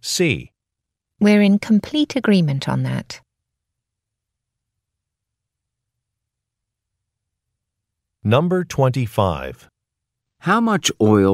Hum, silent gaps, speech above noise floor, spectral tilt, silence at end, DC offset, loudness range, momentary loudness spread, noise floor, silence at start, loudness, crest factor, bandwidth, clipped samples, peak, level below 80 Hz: none; none; 66 dB; -5.5 dB/octave; 0 s; under 0.1%; 9 LU; 12 LU; -83 dBFS; 0.05 s; -18 LUFS; 18 dB; 15 kHz; under 0.1%; -2 dBFS; -52 dBFS